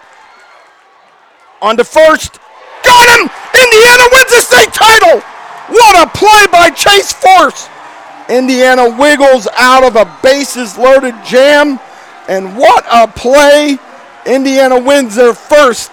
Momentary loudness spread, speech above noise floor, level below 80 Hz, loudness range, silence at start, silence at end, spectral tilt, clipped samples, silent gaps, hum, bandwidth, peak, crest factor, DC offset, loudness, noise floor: 10 LU; 37 dB; -38 dBFS; 5 LU; 1.6 s; 0.05 s; -1.5 dB/octave; 7%; none; none; over 20 kHz; 0 dBFS; 6 dB; under 0.1%; -5 LUFS; -43 dBFS